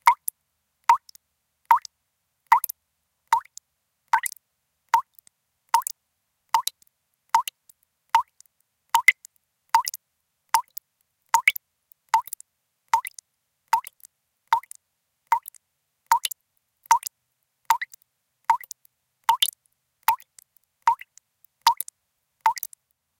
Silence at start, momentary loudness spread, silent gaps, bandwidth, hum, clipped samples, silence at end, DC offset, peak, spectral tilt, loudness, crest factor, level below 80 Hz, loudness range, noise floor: 0.05 s; 16 LU; none; 17 kHz; none; under 0.1%; 0.55 s; under 0.1%; -2 dBFS; 3.5 dB/octave; -24 LUFS; 26 dB; -78 dBFS; 4 LU; -77 dBFS